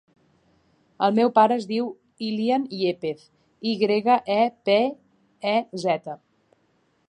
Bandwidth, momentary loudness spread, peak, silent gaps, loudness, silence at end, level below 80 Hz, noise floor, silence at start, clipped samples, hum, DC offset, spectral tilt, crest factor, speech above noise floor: 9.8 kHz; 13 LU; -4 dBFS; none; -23 LUFS; 0.95 s; -74 dBFS; -66 dBFS; 1 s; under 0.1%; none; under 0.1%; -6 dB/octave; 20 dB; 44 dB